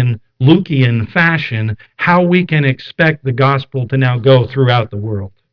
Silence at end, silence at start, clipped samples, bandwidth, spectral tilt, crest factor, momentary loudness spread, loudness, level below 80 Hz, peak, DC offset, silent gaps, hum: 0.25 s; 0 s; under 0.1%; 5.4 kHz; -9 dB/octave; 12 dB; 9 LU; -13 LUFS; -50 dBFS; 0 dBFS; under 0.1%; none; none